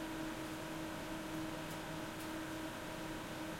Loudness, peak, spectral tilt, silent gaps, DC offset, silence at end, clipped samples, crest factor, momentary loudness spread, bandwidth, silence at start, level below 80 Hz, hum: -44 LUFS; -32 dBFS; -4.5 dB/octave; none; under 0.1%; 0 s; under 0.1%; 14 dB; 1 LU; 16.5 kHz; 0 s; -60 dBFS; none